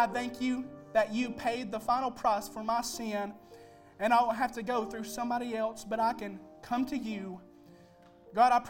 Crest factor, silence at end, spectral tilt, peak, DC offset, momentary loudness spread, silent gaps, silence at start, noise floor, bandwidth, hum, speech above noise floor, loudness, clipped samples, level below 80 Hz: 20 dB; 0 s; -4 dB/octave; -12 dBFS; under 0.1%; 13 LU; none; 0 s; -58 dBFS; 17 kHz; none; 26 dB; -32 LUFS; under 0.1%; -64 dBFS